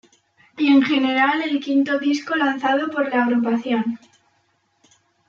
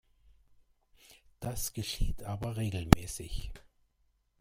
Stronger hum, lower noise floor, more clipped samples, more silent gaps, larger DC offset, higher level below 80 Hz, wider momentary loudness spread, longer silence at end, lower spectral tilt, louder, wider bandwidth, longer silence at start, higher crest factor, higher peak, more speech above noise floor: neither; second, -65 dBFS vs -74 dBFS; neither; neither; neither; second, -72 dBFS vs -40 dBFS; second, 7 LU vs 16 LU; first, 1.35 s vs 0.85 s; about the same, -4.5 dB/octave vs -5 dB/octave; first, -19 LUFS vs -33 LUFS; second, 7.2 kHz vs 16 kHz; second, 0.55 s vs 1.1 s; second, 16 dB vs 32 dB; second, -6 dBFS vs -2 dBFS; about the same, 46 dB vs 43 dB